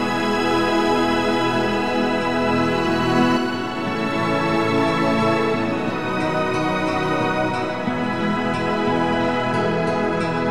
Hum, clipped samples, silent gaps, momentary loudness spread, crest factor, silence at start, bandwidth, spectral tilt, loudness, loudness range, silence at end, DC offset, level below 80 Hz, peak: none; under 0.1%; none; 4 LU; 14 dB; 0 s; 14.5 kHz; -6 dB/octave; -20 LUFS; 2 LU; 0 s; 1%; -48 dBFS; -6 dBFS